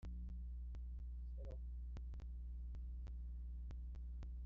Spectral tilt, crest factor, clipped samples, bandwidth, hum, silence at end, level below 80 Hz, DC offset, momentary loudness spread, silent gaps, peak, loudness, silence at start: -9.5 dB/octave; 6 dB; under 0.1%; 3.2 kHz; 60 Hz at -55 dBFS; 0 s; -48 dBFS; under 0.1%; 1 LU; none; -42 dBFS; -52 LUFS; 0 s